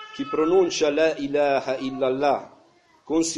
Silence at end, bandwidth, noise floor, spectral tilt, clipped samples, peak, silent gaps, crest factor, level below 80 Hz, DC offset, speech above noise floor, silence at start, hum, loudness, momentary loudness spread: 0 s; 11.5 kHz; -57 dBFS; -3.5 dB/octave; under 0.1%; -8 dBFS; none; 16 dB; -60 dBFS; under 0.1%; 35 dB; 0 s; none; -23 LUFS; 8 LU